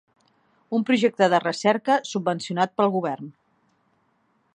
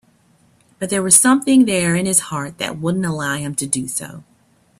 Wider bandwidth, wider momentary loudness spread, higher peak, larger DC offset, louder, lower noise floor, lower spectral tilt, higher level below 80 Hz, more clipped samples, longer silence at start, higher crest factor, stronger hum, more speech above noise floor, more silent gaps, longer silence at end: second, 10 kHz vs 16 kHz; second, 9 LU vs 15 LU; second, -4 dBFS vs 0 dBFS; neither; second, -23 LUFS vs -16 LUFS; first, -67 dBFS vs -56 dBFS; first, -5 dB/octave vs -3.5 dB/octave; second, -76 dBFS vs -56 dBFS; neither; about the same, 0.7 s vs 0.8 s; about the same, 20 dB vs 18 dB; neither; first, 45 dB vs 39 dB; neither; first, 1.25 s vs 0.55 s